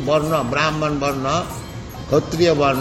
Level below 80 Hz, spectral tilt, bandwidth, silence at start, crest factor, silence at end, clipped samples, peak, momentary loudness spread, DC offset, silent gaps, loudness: -40 dBFS; -5.5 dB/octave; 16 kHz; 0 s; 16 dB; 0 s; under 0.1%; -4 dBFS; 14 LU; under 0.1%; none; -19 LUFS